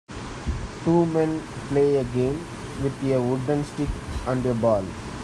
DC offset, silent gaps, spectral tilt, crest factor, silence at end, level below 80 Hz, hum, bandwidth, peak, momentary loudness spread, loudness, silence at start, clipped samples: under 0.1%; none; -7 dB/octave; 16 dB; 0 s; -40 dBFS; none; 12 kHz; -8 dBFS; 11 LU; -25 LUFS; 0.1 s; under 0.1%